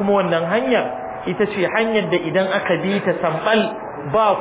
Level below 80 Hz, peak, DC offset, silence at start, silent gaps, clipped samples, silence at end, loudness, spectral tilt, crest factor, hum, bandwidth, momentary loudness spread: -54 dBFS; -4 dBFS; under 0.1%; 0 s; none; under 0.1%; 0 s; -19 LUFS; -9.5 dB/octave; 14 dB; none; 4 kHz; 7 LU